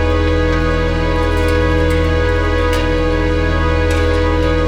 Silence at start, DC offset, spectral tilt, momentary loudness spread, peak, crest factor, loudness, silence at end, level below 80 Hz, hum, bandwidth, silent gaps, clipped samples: 0 s; under 0.1%; -6.5 dB/octave; 2 LU; -2 dBFS; 12 dB; -15 LUFS; 0 s; -18 dBFS; none; 12.5 kHz; none; under 0.1%